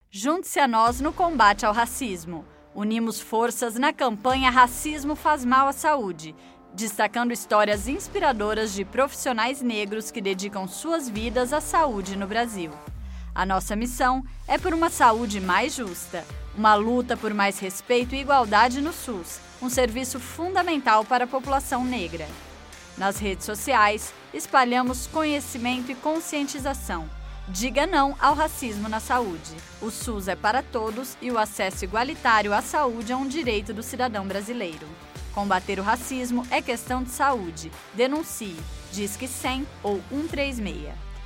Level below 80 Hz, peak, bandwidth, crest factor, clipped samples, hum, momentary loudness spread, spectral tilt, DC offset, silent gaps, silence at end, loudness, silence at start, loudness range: -42 dBFS; -4 dBFS; 16.5 kHz; 22 dB; under 0.1%; none; 14 LU; -3.5 dB/octave; under 0.1%; none; 0 s; -24 LUFS; 0.15 s; 5 LU